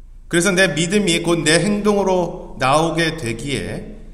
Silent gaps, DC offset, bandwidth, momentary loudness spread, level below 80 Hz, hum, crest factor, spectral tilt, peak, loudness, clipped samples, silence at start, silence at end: none; under 0.1%; 14.5 kHz; 10 LU; -38 dBFS; none; 16 dB; -4 dB/octave; -2 dBFS; -17 LUFS; under 0.1%; 0 s; 0 s